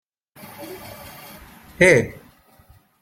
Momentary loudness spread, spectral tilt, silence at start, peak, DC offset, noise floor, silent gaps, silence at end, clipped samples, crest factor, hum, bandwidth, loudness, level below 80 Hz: 26 LU; -5 dB/octave; 0.6 s; -2 dBFS; under 0.1%; -53 dBFS; none; 0.9 s; under 0.1%; 22 dB; none; 16.5 kHz; -17 LUFS; -52 dBFS